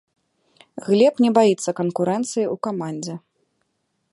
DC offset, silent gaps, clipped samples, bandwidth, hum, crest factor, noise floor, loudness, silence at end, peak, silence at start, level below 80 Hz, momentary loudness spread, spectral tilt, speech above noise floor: under 0.1%; none; under 0.1%; 11.5 kHz; none; 20 dB; -72 dBFS; -20 LUFS; 0.95 s; -2 dBFS; 0.75 s; -72 dBFS; 18 LU; -5.5 dB/octave; 53 dB